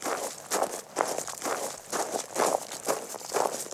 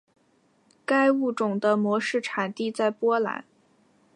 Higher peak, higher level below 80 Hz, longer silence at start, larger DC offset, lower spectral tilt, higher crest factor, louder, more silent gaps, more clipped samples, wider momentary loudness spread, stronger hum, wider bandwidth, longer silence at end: first, -6 dBFS vs -10 dBFS; first, -76 dBFS vs -82 dBFS; second, 0 s vs 0.9 s; neither; second, -1.5 dB/octave vs -5.5 dB/octave; first, 26 dB vs 18 dB; second, -31 LUFS vs -25 LUFS; neither; neither; second, 5 LU vs 8 LU; neither; first, 17.5 kHz vs 11.5 kHz; second, 0 s vs 0.75 s